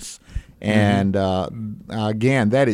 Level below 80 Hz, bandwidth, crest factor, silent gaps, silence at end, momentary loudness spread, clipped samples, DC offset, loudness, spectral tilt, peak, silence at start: -40 dBFS; 13 kHz; 16 dB; none; 0 s; 16 LU; under 0.1%; under 0.1%; -20 LUFS; -6.5 dB/octave; -4 dBFS; 0 s